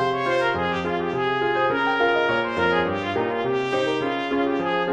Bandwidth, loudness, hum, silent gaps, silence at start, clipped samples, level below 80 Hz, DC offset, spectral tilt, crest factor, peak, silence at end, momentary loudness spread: 9.4 kHz; -22 LUFS; none; none; 0 s; under 0.1%; -54 dBFS; under 0.1%; -6 dB/octave; 14 dB; -8 dBFS; 0 s; 4 LU